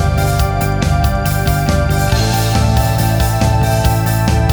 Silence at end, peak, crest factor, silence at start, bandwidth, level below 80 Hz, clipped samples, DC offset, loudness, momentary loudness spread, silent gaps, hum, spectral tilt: 0 s; 0 dBFS; 12 dB; 0 s; over 20 kHz; -20 dBFS; under 0.1%; under 0.1%; -14 LUFS; 2 LU; none; none; -5.5 dB/octave